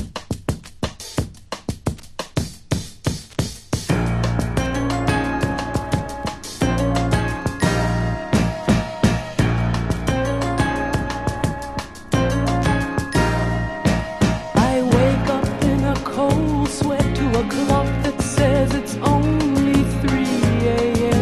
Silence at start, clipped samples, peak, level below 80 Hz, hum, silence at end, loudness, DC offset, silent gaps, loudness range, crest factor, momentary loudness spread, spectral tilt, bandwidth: 0 s; under 0.1%; -2 dBFS; -30 dBFS; none; 0 s; -21 LUFS; under 0.1%; none; 5 LU; 18 dB; 10 LU; -6 dB/octave; 13 kHz